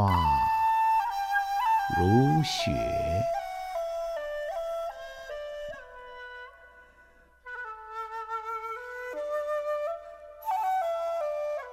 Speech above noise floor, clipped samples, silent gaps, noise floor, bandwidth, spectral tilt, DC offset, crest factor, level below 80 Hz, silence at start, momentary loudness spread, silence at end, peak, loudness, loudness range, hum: 33 dB; under 0.1%; none; -58 dBFS; 16.5 kHz; -6 dB/octave; under 0.1%; 18 dB; -50 dBFS; 0 s; 18 LU; 0 s; -12 dBFS; -29 LUFS; 14 LU; none